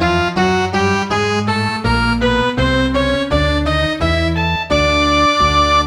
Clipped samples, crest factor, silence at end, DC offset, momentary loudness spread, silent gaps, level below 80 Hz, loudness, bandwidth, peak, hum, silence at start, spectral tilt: under 0.1%; 14 dB; 0 s; under 0.1%; 4 LU; none; -26 dBFS; -15 LUFS; 17.5 kHz; 0 dBFS; none; 0 s; -5 dB/octave